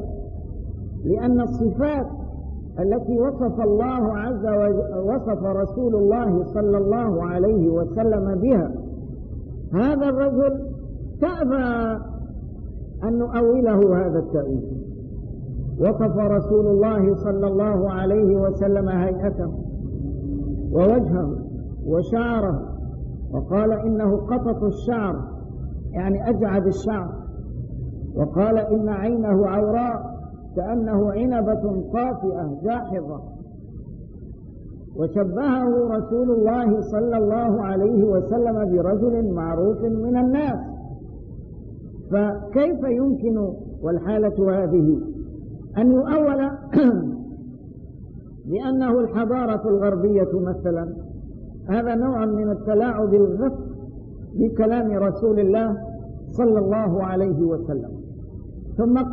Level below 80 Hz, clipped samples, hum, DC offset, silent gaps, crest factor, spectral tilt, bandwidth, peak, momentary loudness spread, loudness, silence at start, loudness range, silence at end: -36 dBFS; under 0.1%; none; 0.1%; none; 14 dB; -9.5 dB/octave; 6.8 kHz; -6 dBFS; 17 LU; -21 LUFS; 0 s; 4 LU; 0 s